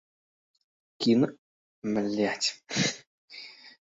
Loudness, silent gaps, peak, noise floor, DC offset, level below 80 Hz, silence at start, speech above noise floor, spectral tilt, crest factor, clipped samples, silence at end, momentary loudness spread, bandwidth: -28 LUFS; 1.38-1.82 s, 3.07-3.28 s; -12 dBFS; -48 dBFS; under 0.1%; -70 dBFS; 1 s; 21 dB; -4 dB/octave; 18 dB; under 0.1%; 0.2 s; 20 LU; 8.2 kHz